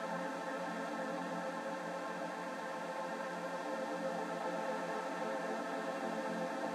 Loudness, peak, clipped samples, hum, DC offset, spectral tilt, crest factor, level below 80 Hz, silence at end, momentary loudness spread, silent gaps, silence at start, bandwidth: -40 LUFS; -28 dBFS; under 0.1%; none; under 0.1%; -4.5 dB/octave; 12 dB; under -90 dBFS; 0 s; 2 LU; none; 0 s; 15.5 kHz